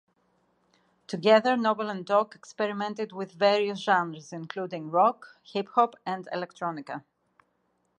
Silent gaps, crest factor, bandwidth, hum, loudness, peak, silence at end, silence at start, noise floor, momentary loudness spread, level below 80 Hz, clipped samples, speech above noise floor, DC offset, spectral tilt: none; 22 dB; 9.8 kHz; none; -27 LUFS; -6 dBFS; 1 s; 1.1 s; -73 dBFS; 16 LU; -80 dBFS; under 0.1%; 46 dB; under 0.1%; -5.5 dB/octave